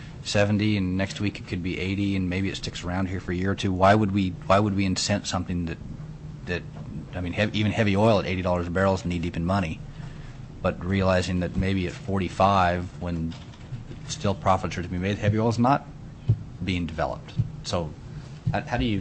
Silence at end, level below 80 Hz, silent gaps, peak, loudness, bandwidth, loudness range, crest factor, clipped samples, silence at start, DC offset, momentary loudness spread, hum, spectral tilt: 0 s; -44 dBFS; none; -8 dBFS; -26 LUFS; 8.6 kHz; 3 LU; 18 dB; under 0.1%; 0 s; under 0.1%; 16 LU; none; -6 dB/octave